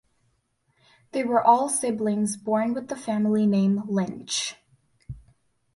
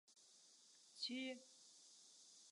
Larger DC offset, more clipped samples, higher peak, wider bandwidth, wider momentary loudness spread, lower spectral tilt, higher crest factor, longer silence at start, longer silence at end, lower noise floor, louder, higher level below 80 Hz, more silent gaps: neither; neither; first, -6 dBFS vs -34 dBFS; about the same, 11.5 kHz vs 11.5 kHz; second, 13 LU vs 19 LU; first, -5 dB/octave vs -1 dB/octave; about the same, 20 dB vs 22 dB; first, 1.15 s vs 0.1 s; first, 0.55 s vs 0 s; about the same, -70 dBFS vs -70 dBFS; first, -24 LUFS vs -52 LUFS; first, -60 dBFS vs under -90 dBFS; neither